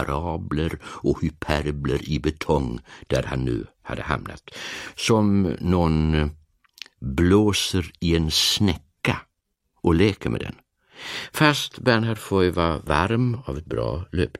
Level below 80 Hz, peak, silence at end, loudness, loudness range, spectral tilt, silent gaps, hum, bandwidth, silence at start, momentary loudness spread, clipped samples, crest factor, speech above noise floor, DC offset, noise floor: -36 dBFS; -2 dBFS; 0 s; -23 LUFS; 4 LU; -5.5 dB/octave; none; none; 15.5 kHz; 0 s; 13 LU; under 0.1%; 22 dB; 52 dB; under 0.1%; -75 dBFS